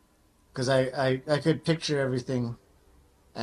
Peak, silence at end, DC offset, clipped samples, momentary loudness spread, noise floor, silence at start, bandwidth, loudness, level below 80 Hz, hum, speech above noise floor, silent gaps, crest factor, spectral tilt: -12 dBFS; 0 s; under 0.1%; under 0.1%; 14 LU; -63 dBFS; 0.55 s; 12 kHz; -28 LUFS; -60 dBFS; none; 37 dB; none; 18 dB; -6 dB/octave